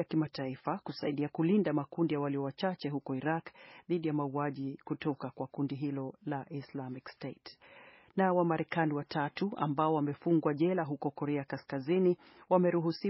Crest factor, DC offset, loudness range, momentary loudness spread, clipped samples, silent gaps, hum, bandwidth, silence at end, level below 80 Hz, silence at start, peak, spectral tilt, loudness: 20 dB; under 0.1%; 6 LU; 12 LU; under 0.1%; none; none; 5.8 kHz; 0 s; -76 dBFS; 0 s; -14 dBFS; -6.5 dB/octave; -34 LUFS